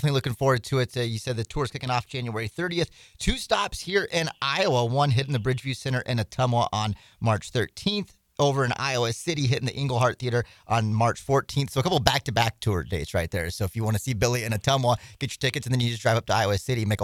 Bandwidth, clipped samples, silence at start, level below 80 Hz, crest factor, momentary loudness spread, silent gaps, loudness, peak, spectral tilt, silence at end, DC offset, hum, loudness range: 16 kHz; under 0.1%; 0 s; -44 dBFS; 26 dB; 6 LU; none; -26 LUFS; 0 dBFS; -5 dB/octave; 0 s; under 0.1%; none; 3 LU